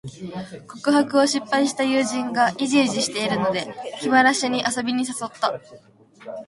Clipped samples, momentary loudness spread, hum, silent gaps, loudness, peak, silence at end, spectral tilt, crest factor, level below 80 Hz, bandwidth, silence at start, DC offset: under 0.1%; 16 LU; none; none; -21 LUFS; -4 dBFS; 0.05 s; -3.5 dB/octave; 18 dB; -64 dBFS; 11.5 kHz; 0.05 s; under 0.1%